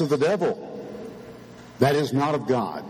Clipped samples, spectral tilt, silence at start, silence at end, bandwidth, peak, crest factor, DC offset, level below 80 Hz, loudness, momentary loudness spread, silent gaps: under 0.1%; -6.5 dB/octave; 0 s; 0 s; 19 kHz; -4 dBFS; 20 dB; under 0.1%; -60 dBFS; -23 LUFS; 21 LU; none